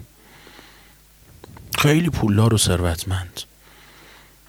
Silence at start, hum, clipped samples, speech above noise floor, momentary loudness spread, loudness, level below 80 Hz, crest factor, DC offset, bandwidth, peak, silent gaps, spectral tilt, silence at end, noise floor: 0 s; none; under 0.1%; 31 dB; 17 LU; -19 LUFS; -44 dBFS; 18 dB; under 0.1%; over 20 kHz; -4 dBFS; none; -5 dB/octave; 1.05 s; -50 dBFS